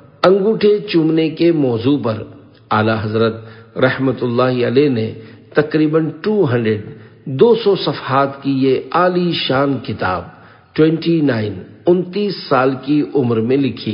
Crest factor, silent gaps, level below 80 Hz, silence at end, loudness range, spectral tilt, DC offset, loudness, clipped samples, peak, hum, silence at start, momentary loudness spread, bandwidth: 16 dB; none; -50 dBFS; 0 s; 2 LU; -9 dB/octave; under 0.1%; -16 LUFS; under 0.1%; 0 dBFS; none; 0.2 s; 9 LU; 5.4 kHz